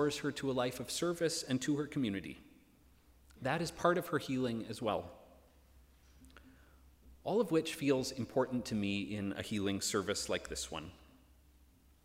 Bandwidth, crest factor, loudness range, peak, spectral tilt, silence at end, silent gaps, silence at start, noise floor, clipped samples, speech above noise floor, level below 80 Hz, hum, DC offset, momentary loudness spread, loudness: 16 kHz; 22 dB; 4 LU; -16 dBFS; -4.5 dB/octave; 1 s; none; 0 s; -65 dBFS; under 0.1%; 29 dB; -64 dBFS; none; under 0.1%; 9 LU; -36 LUFS